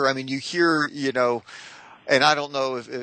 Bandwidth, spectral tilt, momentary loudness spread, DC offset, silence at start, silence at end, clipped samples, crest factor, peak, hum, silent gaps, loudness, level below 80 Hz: 9 kHz; -4 dB/octave; 21 LU; under 0.1%; 0 s; 0 s; under 0.1%; 20 dB; -2 dBFS; none; none; -22 LUFS; -72 dBFS